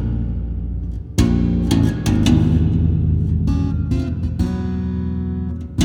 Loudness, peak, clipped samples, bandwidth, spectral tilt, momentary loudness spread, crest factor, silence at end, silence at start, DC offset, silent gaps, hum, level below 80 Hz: -19 LUFS; -2 dBFS; under 0.1%; 15.5 kHz; -7 dB/octave; 10 LU; 16 dB; 0 s; 0 s; under 0.1%; none; none; -24 dBFS